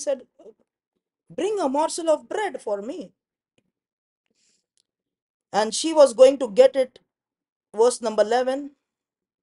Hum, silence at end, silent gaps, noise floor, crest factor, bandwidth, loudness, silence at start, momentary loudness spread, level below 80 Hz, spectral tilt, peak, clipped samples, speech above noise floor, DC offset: none; 0.75 s; 0.87-0.92 s, 3.93-4.24 s, 5.22-5.40 s, 7.52-7.60 s; -87 dBFS; 22 dB; 11.5 kHz; -21 LUFS; 0 s; 15 LU; -72 dBFS; -3 dB/octave; -2 dBFS; under 0.1%; 67 dB; under 0.1%